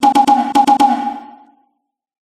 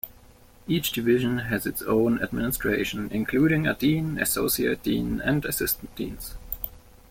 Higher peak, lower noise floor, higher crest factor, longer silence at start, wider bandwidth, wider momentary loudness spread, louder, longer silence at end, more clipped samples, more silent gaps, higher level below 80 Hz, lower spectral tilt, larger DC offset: first, 0 dBFS vs -10 dBFS; first, -67 dBFS vs -52 dBFS; about the same, 14 dB vs 16 dB; about the same, 0 s vs 0.05 s; second, 14 kHz vs 17 kHz; about the same, 13 LU vs 11 LU; first, -13 LUFS vs -25 LUFS; first, 1.1 s vs 0.35 s; neither; neither; second, -58 dBFS vs -46 dBFS; second, -3.5 dB/octave vs -5 dB/octave; neither